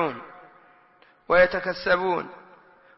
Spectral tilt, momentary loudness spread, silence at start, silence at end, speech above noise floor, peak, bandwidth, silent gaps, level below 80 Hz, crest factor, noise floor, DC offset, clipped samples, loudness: -8 dB/octave; 21 LU; 0 s; 0.6 s; 35 dB; -8 dBFS; 5.8 kHz; none; -54 dBFS; 18 dB; -58 dBFS; under 0.1%; under 0.1%; -23 LUFS